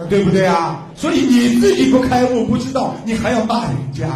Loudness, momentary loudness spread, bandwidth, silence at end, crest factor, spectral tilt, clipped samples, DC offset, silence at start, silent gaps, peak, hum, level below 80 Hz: -15 LUFS; 8 LU; 14 kHz; 0 s; 12 dB; -6 dB/octave; under 0.1%; under 0.1%; 0 s; none; -2 dBFS; none; -40 dBFS